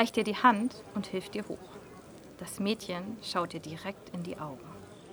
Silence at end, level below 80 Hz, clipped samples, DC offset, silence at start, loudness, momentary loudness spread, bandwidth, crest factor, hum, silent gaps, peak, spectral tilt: 0 s; -66 dBFS; under 0.1%; under 0.1%; 0 s; -33 LUFS; 23 LU; over 20 kHz; 26 dB; none; none; -8 dBFS; -5 dB/octave